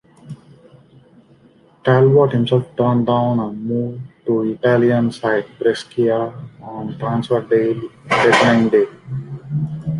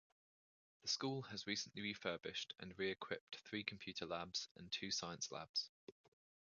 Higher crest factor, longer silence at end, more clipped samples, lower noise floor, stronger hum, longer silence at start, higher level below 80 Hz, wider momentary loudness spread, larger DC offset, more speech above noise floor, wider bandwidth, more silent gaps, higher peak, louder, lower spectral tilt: second, 16 dB vs 24 dB; second, 0 s vs 0.5 s; neither; second, -51 dBFS vs under -90 dBFS; neither; second, 0.25 s vs 0.85 s; first, -54 dBFS vs -78 dBFS; first, 16 LU vs 7 LU; neither; second, 34 dB vs over 43 dB; first, 11 kHz vs 7.2 kHz; second, none vs 3.21-3.27 s, 4.51-4.55 s, 5.49-5.54 s, 5.69-5.88 s; first, -2 dBFS vs -24 dBFS; first, -17 LUFS vs -46 LUFS; first, -7 dB/octave vs -2 dB/octave